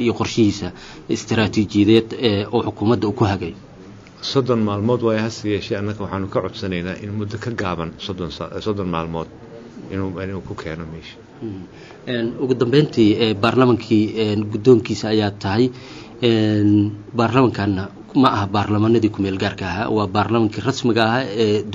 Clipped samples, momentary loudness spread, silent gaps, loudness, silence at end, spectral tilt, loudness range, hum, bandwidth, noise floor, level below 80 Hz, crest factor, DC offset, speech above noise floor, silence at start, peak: under 0.1%; 14 LU; none; -19 LUFS; 0 s; -5.5 dB/octave; 10 LU; none; 7.8 kHz; -41 dBFS; -50 dBFS; 18 dB; under 0.1%; 22 dB; 0 s; -2 dBFS